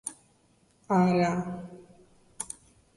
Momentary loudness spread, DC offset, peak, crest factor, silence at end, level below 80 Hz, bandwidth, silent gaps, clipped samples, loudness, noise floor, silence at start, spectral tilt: 19 LU; under 0.1%; -12 dBFS; 20 dB; 0.5 s; -64 dBFS; 11.5 kHz; none; under 0.1%; -28 LUFS; -65 dBFS; 0.05 s; -6 dB/octave